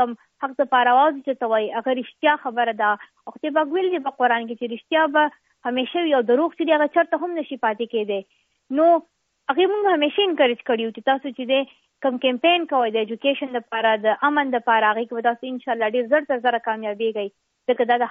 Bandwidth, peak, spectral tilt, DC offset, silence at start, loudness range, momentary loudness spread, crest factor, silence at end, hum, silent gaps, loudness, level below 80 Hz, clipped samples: 4.7 kHz; -6 dBFS; -0.5 dB/octave; under 0.1%; 0 s; 2 LU; 9 LU; 16 dB; 0 s; none; none; -21 LUFS; -76 dBFS; under 0.1%